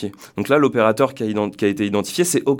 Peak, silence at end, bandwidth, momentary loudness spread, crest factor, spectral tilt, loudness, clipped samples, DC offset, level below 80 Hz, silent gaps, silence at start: -2 dBFS; 0 s; 19 kHz; 6 LU; 18 dB; -5 dB/octave; -19 LUFS; under 0.1%; under 0.1%; -62 dBFS; none; 0 s